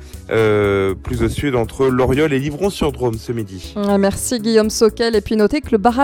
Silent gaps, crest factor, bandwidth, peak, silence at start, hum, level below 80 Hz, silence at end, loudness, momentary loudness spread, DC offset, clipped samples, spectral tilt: none; 16 dB; 17.5 kHz; 0 dBFS; 0 s; none; -34 dBFS; 0 s; -17 LUFS; 7 LU; under 0.1%; under 0.1%; -5.5 dB/octave